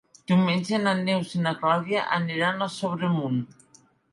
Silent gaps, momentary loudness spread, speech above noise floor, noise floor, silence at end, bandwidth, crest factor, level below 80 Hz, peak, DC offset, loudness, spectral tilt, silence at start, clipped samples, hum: none; 6 LU; 34 dB; -59 dBFS; 0.65 s; 11.5 kHz; 16 dB; -70 dBFS; -8 dBFS; under 0.1%; -25 LUFS; -6 dB/octave; 0.3 s; under 0.1%; none